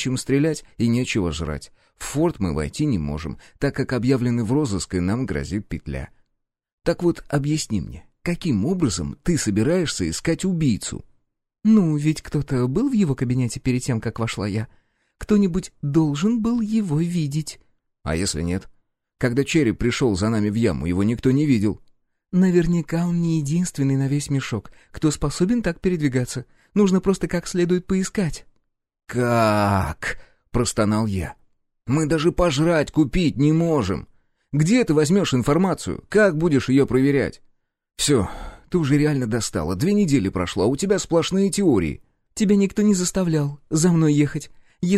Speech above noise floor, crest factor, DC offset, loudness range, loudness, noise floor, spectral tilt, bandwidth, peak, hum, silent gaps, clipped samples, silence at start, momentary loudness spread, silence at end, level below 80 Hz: 54 dB; 16 dB; under 0.1%; 4 LU; -21 LUFS; -74 dBFS; -6 dB/octave; 15 kHz; -6 dBFS; none; 6.73-6.78 s; under 0.1%; 0 s; 11 LU; 0 s; -40 dBFS